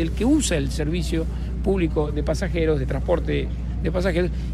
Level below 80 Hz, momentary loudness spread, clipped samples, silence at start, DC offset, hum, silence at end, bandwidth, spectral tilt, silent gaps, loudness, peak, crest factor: -26 dBFS; 6 LU; under 0.1%; 0 s; under 0.1%; none; 0 s; 13 kHz; -6 dB/octave; none; -23 LUFS; -8 dBFS; 14 dB